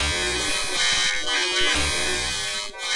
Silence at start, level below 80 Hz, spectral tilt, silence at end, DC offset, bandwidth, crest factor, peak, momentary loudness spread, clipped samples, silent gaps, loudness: 0 s; -38 dBFS; -1 dB/octave; 0 s; under 0.1%; 11.5 kHz; 14 dB; -10 dBFS; 5 LU; under 0.1%; none; -21 LUFS